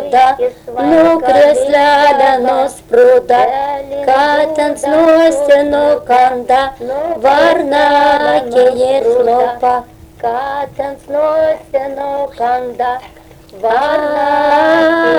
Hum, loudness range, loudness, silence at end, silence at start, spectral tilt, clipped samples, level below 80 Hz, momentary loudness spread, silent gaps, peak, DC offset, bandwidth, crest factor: none; 7 LU; -11 LUFS; 0 s; 0 s; -4 dB/octave; under 0.1%; -44 dBFS; 10 LU; none; 0 dBFS; under 0.1%; 19 kHz; 10 dB